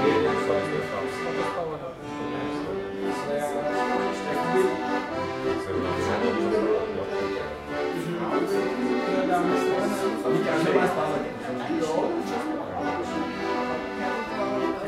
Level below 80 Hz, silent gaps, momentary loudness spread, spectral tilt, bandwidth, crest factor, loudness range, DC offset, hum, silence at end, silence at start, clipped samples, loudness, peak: -56 dBFS; none; 7 LU; -5.5 dB/octave; 15 kHz; 18 dB; 4 LU; under 0.1%; none; 0 s; 0 s; under 0.1%; -27 LUFS; -8 dBFS